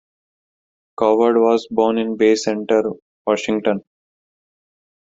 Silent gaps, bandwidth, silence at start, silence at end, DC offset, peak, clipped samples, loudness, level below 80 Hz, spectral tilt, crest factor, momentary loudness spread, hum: 3.02-3.25 s; 7.8 kHz; 1 s; 1.3 s; under 0.1%; -2 dBFS; under 0.1%; -18 LUFS; -62 dBFS; -5 dB/octave; 16 dB; 8 LU; none